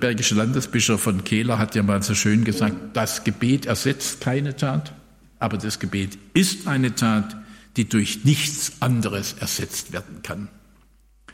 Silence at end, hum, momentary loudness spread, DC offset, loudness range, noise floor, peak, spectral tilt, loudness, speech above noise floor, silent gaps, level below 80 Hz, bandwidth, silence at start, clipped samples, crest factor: 0 s; none; 10 LU; under 0.1%; 3 LU; -55 dBFS; -6 dBFS; -4.5 dB/octave; -22 LUFS; 33 dB; none; -54 dBFS; 16.5 kHz; 0 s; under 0.1%; 16 dB